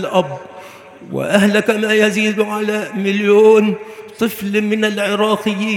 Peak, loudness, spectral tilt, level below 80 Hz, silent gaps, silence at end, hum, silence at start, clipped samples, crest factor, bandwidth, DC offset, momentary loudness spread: 0 dBFS; -15 LUFS; -5 dB/octave; -62 dBFS; none; 0 s; none; 0 s; under 0.1%; 16 dB; 16.5 kHz; under 0.1%; 16 LU